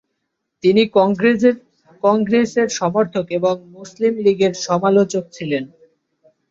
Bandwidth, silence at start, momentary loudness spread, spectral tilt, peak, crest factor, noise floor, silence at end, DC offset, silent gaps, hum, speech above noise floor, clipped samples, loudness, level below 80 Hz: 7.8 kHz; 0.65 s; 9 LU; -5.5 dB/octave; -2 dBFS; 16 dB; -75 dBFS; 0.85 s; under 0.1%; none; none; 58 dB; under 0.1%; -17 LUFS; -60 dBFS